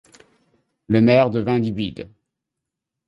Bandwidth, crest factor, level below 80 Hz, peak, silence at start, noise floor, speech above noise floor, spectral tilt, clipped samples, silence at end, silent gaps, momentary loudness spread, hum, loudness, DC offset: 7.4 kHz; 18 dB; -52 dBFS; -4 dBFS; 0.9 s; -83 dBFS; 65 dB; -8.5 dB/octave; under 0.1%; 1 s; none; 19 LU; none; -19 LUFS; under 0.1%